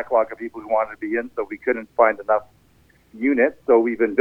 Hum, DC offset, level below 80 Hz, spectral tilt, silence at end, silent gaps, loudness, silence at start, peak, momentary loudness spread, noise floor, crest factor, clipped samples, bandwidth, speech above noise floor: none; under 0.1%; -60 dBFS; -8 dB/octave; 0 s; none; -21 LUFS; 0 s; -2 dBFS; 9 LU; -57 dBFS; 18 dB; under 0.1%; 4.4 kHz; 36 dB